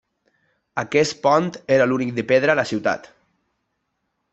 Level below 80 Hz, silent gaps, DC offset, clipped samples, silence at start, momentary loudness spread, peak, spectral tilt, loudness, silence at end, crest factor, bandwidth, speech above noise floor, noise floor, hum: -64 dBFS; none; under 0.1%; under 0.1%; 0.75 s; 10 LU; -4 dBFS; -5 dB/octave; -20 LUFS; 1.35 s; 18 dB; 8.2 kHz; 55 dB; -74 dBFS; none